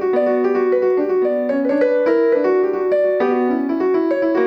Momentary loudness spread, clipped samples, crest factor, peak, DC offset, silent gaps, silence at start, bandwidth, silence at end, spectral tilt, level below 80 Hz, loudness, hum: 3 LU; under 0.1%; 10 dB; -6 dBFS; under 0.1%; none; 0 s; 5.8 kHz; 0 s; -7.5 dB/octave; -62 dBFS; -17 LUFS; none